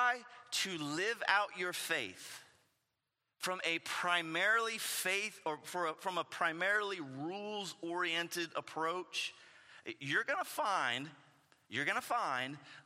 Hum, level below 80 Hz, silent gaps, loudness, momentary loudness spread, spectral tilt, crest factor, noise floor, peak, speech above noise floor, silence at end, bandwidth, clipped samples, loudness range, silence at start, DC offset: none; under -90 dBFS; none; -36 LUFS; 10 LU; -2 dB/octave; 24 dB; -87 dBFS; -14 dBFS; 49 dB; 0.05 s; 16 kHz; under 0.1%; 3 LU; 0 s; under 0.1%